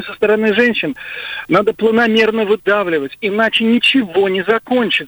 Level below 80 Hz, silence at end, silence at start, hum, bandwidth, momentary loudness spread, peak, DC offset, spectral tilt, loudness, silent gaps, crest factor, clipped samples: -54 dBFS; 0 s; 0 s; none; over 20 kHz; 8 LU; -2 dBFS; under 0.1%; -5.5 dB/octave; -14 LUFS; none; 12 dB; under 0.1%